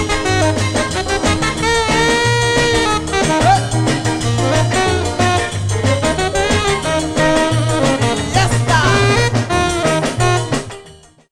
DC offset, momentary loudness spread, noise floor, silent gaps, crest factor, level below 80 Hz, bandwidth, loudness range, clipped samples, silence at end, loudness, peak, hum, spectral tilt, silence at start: under 0.1%; 4 LU; -42 dBFS; none; 14 dB; -30 dBFS; 14 kHz; 1 LU; under 0.1%; 0.35 s; -15 LUFS; 0 dBFS; none; -4.5 dB/octave; 0 s